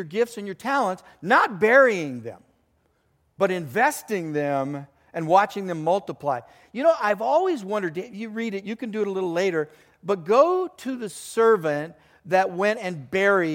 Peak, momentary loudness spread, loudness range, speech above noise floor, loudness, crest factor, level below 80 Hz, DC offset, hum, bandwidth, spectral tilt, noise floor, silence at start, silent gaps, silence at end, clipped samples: -4 dBFS; 14 LU; 3 LU; 44 dB; -23 LUFS; 20 dB; -70 dBFS; under 0.1%; none; 17 kHz; -5 dB/octave; -67 dBFS; 0 s; none; 0 s; under 0.1%